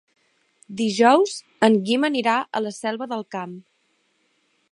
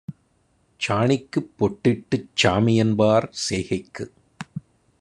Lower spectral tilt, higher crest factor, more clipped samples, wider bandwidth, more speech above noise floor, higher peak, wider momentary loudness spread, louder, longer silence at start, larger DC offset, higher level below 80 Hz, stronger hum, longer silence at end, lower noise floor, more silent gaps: about the same, -4.5 dB/octave vs -5.5 dB/octave; about the same, 22 dB vs 20 dB; neither; about the same, 11.5 kHz vs 11 kHz; first, 47 dB vs 43 dB; about the same, -2 dBFS vs -4 dBFS; about the same, 16 LU vs 18 LU; about the same, -21 LUFS vs -22 LUFS; first, 0.7 s vs 0.1 s; neither; second, -76 dBFS vs -58 dBFS; neither; first, 1.1 s vs 0.4 s; about the same, -67 dBFS vs -64 dBFS; neither